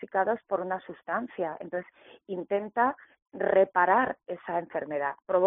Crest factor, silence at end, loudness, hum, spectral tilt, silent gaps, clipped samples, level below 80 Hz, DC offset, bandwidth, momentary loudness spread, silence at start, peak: 18 dB; 0 s; -29 LUFS; none; 0.5 dB/octave; 3.22-3.26 s; under 0.1%; -72 dBFS; under 0.1%; 3.8 kHz; 14 LU; 0 s; -10 dBFS